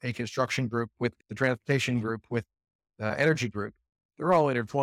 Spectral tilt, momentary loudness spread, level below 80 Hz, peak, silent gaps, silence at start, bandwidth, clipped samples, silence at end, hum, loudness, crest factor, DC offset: -6 dB/octave; 10 LU; -66 dBFS; -12 dBFS; 2.75-2.79 s, 4.05-4.09 s; 0.05 s; 15 kHz; under 0.1%; 0 s; none; -29 LUFS; 18 dB; under 0.1%